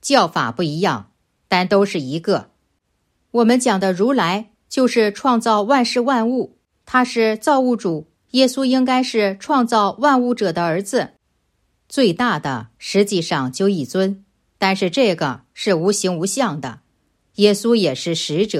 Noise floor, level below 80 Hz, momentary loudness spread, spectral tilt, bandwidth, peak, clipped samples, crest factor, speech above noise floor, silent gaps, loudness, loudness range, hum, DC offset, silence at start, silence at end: -68 dBFS; -62 dBFS; 8 LU; -4.5 dB/octave; 14.5 kHz; 0 dBFS; under 0.1%; 18 dB; 51 dB; none; -18 LUFS; 3 LU; none; under 0.1%; 0.05 s; 0 s